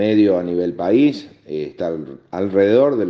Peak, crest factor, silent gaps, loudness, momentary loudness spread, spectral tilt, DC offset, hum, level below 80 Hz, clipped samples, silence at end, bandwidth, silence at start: -4 dBFS; 14 dB; none; -18 LUFS; 15 LU; -8 dB/octave; under 0.1%; none; -60 dBFS; under 0.1%; 0 s; 6.4 kHz; 0 s